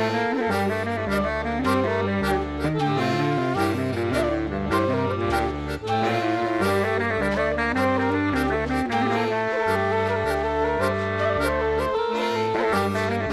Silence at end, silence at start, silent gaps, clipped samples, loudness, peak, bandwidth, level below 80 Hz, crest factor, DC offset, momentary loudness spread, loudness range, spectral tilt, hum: 0 s; 0 s; none; under 0.1%; -23 LUFS; -10 dBFS; 14 kHz; -42 dBFS; 14 dB; under 0.1%; 2 LU; 1 LU; -6 dB/octave; none